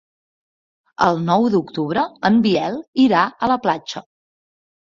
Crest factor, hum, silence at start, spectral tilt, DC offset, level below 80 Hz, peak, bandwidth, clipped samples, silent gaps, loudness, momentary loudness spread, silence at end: 18 dB; none; 1 s; -6.5 dB/octave; under 0.1%; -58 dBFS; -2 dBFS; 7.4 kHz; under 0.1%; 2.88-2.93 s; -18 LUFS; 8 LU; 0.95 s